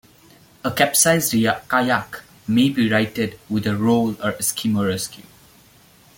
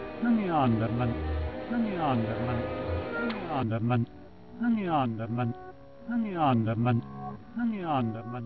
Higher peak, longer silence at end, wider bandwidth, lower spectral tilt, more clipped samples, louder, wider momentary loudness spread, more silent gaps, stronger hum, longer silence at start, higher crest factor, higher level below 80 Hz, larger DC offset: first, -2 dBFS vs -14 dBFS; first, 1 s vs 0 s; first, 17 kHz vs 5.4 kHz; second, -4 dB/octave vs -11 dB/octave; neither; first, -19 LUFS vs -30 LUFS; about the same, 11 LU vs 9 LU; neither; neither; first, 0.65 s vs 0 s; about the same, 20 dB vs 16 dB; second, -56 dBFS vs -46 dBFS; second, under 0.1% vs 0.2%